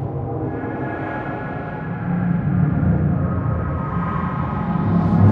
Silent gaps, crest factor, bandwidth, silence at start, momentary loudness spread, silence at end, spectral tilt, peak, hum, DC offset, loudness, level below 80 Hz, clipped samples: none; 18 dB; 4.2 kHz; 0 s; 8 LU; 0 s; -11.5 dB/octave; -2 dBFS; none; under 0.1%; -22 LUFS; -36 dBFS; under 0.1%